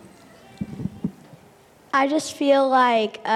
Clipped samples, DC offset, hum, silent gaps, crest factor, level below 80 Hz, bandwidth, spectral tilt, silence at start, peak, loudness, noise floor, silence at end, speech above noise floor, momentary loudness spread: under 0.1%; under 0.1%; none; none; 16 dB; -58 dBFS; 14 kHz; -4.5 dB/octave; 0.6 s; -6 dBFS; -21 LUFS; -52 dBFS; 0 s; 32 dB; 16 LU